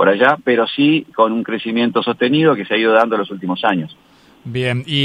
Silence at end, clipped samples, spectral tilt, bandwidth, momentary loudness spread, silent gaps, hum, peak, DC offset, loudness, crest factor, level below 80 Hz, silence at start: 0 s; under 0.1%; -7 dB/octave; 10 kHz; 8 LU; none; none; 0 dBFS; under 0.1%; -16 LUFS; 16 dB; -60 dBFS; 0 s